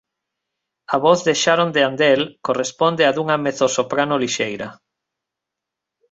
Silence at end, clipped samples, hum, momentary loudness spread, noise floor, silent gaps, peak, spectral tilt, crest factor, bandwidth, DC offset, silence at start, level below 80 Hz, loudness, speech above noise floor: 1.35 s; under 0.1%; none; 7 LU; -84 dBFS; none; -2 dBFS; -3.5 dB/octave; 18 dB; 8.2 kHz; under 0.1%; 0.9 s; -62 dBFS; -18 LUFS; 66 dB